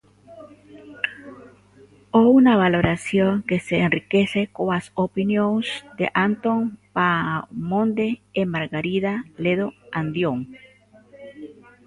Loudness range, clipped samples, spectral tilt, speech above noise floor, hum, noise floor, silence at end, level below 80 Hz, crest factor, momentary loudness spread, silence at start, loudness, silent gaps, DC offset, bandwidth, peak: 6 LU; under 0.1%; -7 dB/octave; 31 dB; 50 Hz at -40 dBFS; -52 dBFS; 0.35 s; -52 dBFS; 18 dB; 11 LU; 0.3 s; -21 LUFS; none; under 0.1%; 11.5 kHz; -4 dBFS